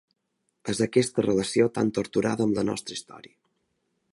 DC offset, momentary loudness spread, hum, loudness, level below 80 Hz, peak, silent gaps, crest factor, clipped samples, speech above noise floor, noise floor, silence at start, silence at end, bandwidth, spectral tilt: under 0.1%; 11 LU; none; -25 LUFS; -60 dBFS; -8 dBFS; none; 20 dB; under 0.1%; 50 dB; -75 dBFS; 0.65 s; 0.95 s; 11.5 kHz; -5 dB/octave